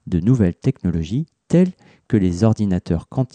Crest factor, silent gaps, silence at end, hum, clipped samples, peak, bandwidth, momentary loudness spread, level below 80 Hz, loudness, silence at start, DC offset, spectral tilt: 14 dB; none; 0.1 s; none; under 0.1%; -4 dBFS; 9.2 kHz; 6 LU; -40 dBFS; -19 LUFS; 0.05 s; under 0.1%; -8.5 dB/octave